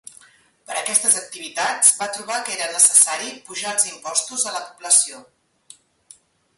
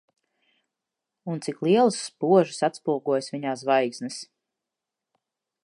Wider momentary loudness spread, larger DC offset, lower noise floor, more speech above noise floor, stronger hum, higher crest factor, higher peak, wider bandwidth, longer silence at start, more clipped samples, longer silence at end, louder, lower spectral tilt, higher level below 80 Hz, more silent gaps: about the same, 15 LU vs 14 LU; neither; second, -53 dBFS vs -87 dBFS; second, 33 dB vs 63 dB; neither; about the same, 22 dB vs 20 dB; first, 0 dBFS vs -6 dBFS; first, 16 kHz vs 11.5 kHz; second, 0.7 s vs 1.25 s; neither; about the same, 1.35 s vs 1.4 s; first, -17 LUFS vs -24 LUFS; second, 1.5 dB/octave vs -5.5 dB/octave; first, -74 dBFS vs -80 dBFS; neither